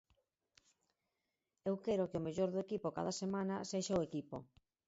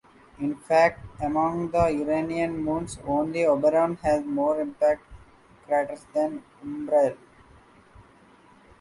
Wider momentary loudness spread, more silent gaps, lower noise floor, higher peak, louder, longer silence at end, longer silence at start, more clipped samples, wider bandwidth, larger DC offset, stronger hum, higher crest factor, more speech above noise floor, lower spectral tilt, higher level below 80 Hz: second, 8 LU vs 11 LU; neither; first, -89 dBFS vs -55 dBFS; second, -24 dBFS vs -6 dBFS; second, -40 LUFS vs -25 LUFS; second, 0.45 s vs 0.8 s; first, 1.65 s vs 0.4 s; neither; second, 7.6 kHz vs 11.5 kHz; neither; neither; about the same, 18 dB vs 20 dB; first, 50 dB vs 30 dB; about the same, -6.5 dB/octave vs -6.5 dB/octave; second, -72 dBFS vs -52 dBFS